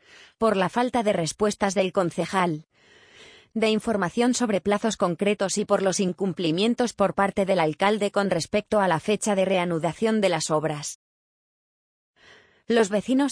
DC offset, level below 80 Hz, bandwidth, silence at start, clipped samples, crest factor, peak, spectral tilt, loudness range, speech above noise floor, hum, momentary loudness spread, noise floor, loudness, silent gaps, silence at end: under 0.1%; -60 dBFS; 10.5 kHz; 0.4 s; under 0.1%; 18 dB; -6 dBFS; -4.5 dB/octave; 3 LU; 31 dB; none; 4 LU; -55 dBFS; -24 LUFS; 10.95-12.14 s; 0 s